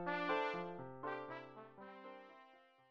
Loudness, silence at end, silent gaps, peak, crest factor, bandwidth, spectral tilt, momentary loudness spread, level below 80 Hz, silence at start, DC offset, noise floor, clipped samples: -44 LUFS; 0.1 s; none; -24 dBFS; 20 dB; 7.8 kHz; -6.5 dB/octave; 21 LU; -82 dBFS; 0 s; under 0.1%; -66 dBFS; under 0.1%